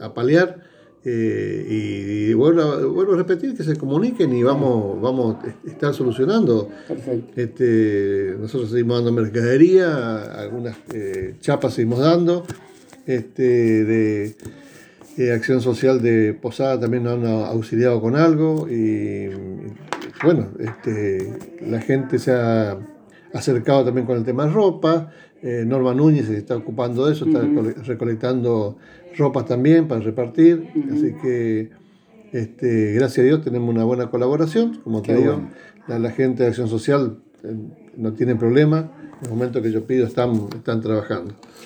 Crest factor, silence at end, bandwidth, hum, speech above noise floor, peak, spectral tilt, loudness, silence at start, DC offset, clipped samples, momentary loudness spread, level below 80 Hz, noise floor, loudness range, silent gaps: 18 dB; 0 s; 9.6 kHz; none; 30 dB; -2 dBFS; -8 dB/octave; -20 LUFS; 0 s; under 0.1%; under 0.1%; 14 LU; -62 dBFS; -49 dBFS; 3 LU; none